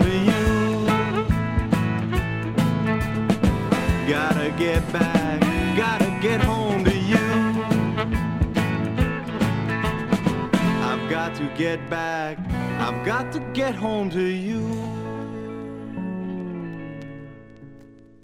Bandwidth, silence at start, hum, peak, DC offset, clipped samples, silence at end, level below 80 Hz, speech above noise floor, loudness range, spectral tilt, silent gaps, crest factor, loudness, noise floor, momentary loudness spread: 16.5 kHz; 0 s; none; -4 dBFS; under 0.1%; under 0.1%; 0.3 s; -36 dBFS; 22 dB; 7 LU; -6.5 dB/octave; none; 20 dB; -23 LUFS; -47 dBFS; 10 LU